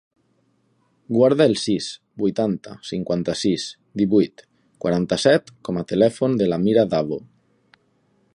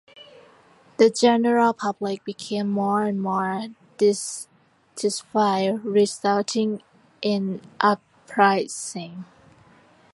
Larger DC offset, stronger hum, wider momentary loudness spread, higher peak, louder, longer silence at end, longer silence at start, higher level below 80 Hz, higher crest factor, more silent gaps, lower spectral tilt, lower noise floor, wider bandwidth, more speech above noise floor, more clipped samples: neither; neither; second, 11 LU vs 15 LU; about the same, -4 dBFS vs -2 dBFS; about the same, -21 LUFS vs -23 LUFS; first, 1.15 s vs 0.9 s; first, 1.1 s vs 0.2 s; first, -56 dBFS vs -70 dBFS; about the same, 18 dB vs 22 dB; neither; first, -6 dB/octave vs -4.5 dB/octave; first, -65 dBFS vs -55 dBFS; about the same, 11 kHz vs 11.5 kHz; first, 45 dB vs 33 dB; neither